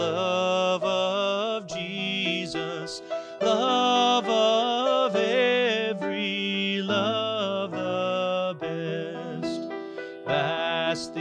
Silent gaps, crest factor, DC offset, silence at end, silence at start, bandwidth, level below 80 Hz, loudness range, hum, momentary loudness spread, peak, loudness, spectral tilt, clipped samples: none; 16 dB; under 0.1%; 0 s; 0 s; 10.5 kHz; -68 dBFS; 6 LU; none; 11 LU; -10 dBFS; -25 LUFS; -4 dB/octave; under 0.1%